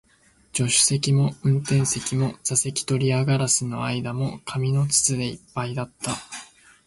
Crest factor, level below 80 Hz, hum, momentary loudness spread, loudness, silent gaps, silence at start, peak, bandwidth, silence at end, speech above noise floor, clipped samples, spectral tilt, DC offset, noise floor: 18 dB; -56 dBFS; none; 11 LU; -23 LUFS; none; 0.55 s; -6 dBFS; 12 kHz; 0.4 s; 36 dB; under 0.1%; -4 dB/octave; under 0.1%; -59 dBFS